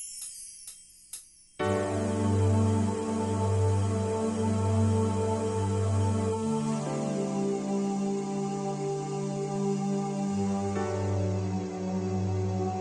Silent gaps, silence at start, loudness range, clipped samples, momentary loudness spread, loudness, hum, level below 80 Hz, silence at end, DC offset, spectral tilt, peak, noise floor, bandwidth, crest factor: none; 0 s; 3 LU; under 0.1%; 7 LU; -29 LUFS; none; -62 dBFS; 0 s; under 0.1%; -7 dB/octave; -14 dBFS; -49 dBFS; 11.5 kHz; 14 dB